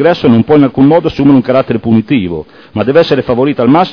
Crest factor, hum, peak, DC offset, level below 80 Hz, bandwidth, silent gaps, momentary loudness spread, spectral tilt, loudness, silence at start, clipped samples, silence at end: 8 dB; none; 0 dBFS; under 0.1%; -40 dBFS; 5.4 kHz; none; 8 LU; -9 dB/octave; -9 LUFS; 0 s; 2%; 0 s